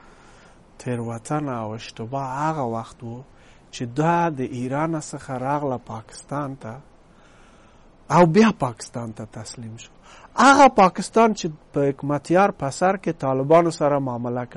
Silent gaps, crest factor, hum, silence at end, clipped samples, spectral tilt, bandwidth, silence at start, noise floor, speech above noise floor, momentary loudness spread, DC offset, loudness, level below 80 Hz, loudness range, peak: none; 18 dB; none; 0 s; under 0.1%; -6 dB/octave; 11.5 kHz; 0.8 s; -50 dBFS; 29 dB; 20 LU; under 0.1%; -21 LUFS; -52 dBFS; 10 LU; -4 dBFS